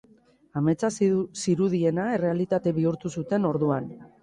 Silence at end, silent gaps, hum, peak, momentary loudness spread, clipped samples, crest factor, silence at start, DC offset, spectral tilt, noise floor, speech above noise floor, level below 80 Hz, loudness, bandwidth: 0.15 s; none; none; -10 dBFS; 5 LU; under 0.1%; 14 dB; 0.55 s; under 0.1%; -7 dB/octave; -59 dBFS; 34 dB; -62 dBFS; -26 LUFS; 11.5 kHz